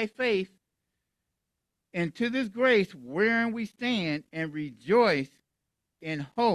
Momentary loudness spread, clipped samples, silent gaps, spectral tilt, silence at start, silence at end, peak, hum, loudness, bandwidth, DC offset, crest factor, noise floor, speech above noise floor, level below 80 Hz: 13 LU; under 0.1%; none; -6 dB/octave; 0 s; 0 s; -12 dBFS; none; -28 LUFS; 12 kHz; under 0.1%; 18 dB; -84 dBFS; 57 dB; -70 dBFS